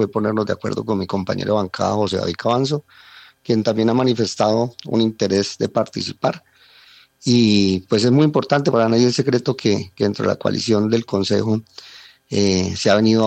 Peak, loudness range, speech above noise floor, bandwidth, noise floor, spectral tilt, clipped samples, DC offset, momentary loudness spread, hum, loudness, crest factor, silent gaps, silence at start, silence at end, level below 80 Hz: -2 dBFS; 4 LU; 31 dB; 9 kHz; -49 dBFS; -5.5 dB/octave; under 0.1%; under 0.1%; 8 LU; none; -19 LUFS; 18 dB; none; 0 s; 0 s; -60 dBFS